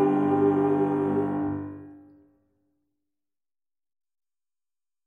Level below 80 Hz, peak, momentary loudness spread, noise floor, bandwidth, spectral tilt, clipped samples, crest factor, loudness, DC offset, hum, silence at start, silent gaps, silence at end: -66 dBFS; -12 dBFS; 14 LU; under -90 dBFS; 3.5 kHz; -10.5 dB/octave; under 0.1%; 18 dB; -25 LUFS; under 0.1%; none; 0 s; none; 3.1 s